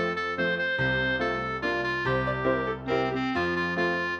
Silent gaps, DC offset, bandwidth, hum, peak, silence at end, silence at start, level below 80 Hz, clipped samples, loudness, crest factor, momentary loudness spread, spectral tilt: none; under 0.1%; 8.4 kHz; none; -14 dBFS; 0 s; 0 s; -48 dBFS; under 0.1%; -27 LUFS; 14 dB; 3 LU; -6.5 dB/octave